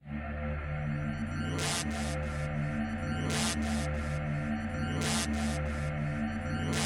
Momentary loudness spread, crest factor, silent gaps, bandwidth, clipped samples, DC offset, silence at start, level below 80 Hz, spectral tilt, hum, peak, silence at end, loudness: 5 LU; 14 dB; none; 16 kHz; under 0.1%; under 0.1%; 0 s; -42 dBFS; -4.5 dB/octave; none; -20 dBFS; 0 s; -33 LUFS